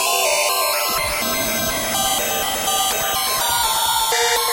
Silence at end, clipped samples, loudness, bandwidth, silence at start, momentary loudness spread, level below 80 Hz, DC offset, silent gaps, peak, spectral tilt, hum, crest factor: 0 s; under 0.1%; -17 LUFS; 16.5 kHz; 0 s; 3 LU; -44 dBFS; under 0.1%; none; -4 dBFS; 0 dB/octave; none; 14 dB